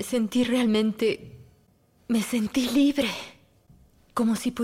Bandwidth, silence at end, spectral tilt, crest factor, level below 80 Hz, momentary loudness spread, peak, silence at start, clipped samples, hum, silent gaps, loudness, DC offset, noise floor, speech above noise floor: 16 kHz; 0 s; -4.5 dB/octave; 14 dB; -58 dBFS; 12 LU; -12 dBFS; 0 s; under 0.1%; none; none; -25 LUFS; under 0.1%; -62 dBFS; 38 dB